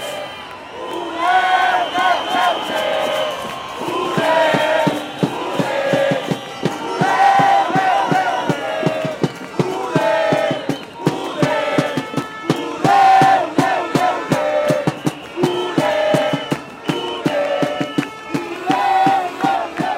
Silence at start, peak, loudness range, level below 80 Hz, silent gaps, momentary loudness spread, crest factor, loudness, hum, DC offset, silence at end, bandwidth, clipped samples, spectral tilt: 0 s; 0 dBFS; 4 LU; -58 dBFS; none; 10 LU; 18 dB; -18 LUFS; none; under 0.1%; 0 s; 16.5 kHz; under 0.1%; -5 dB/octave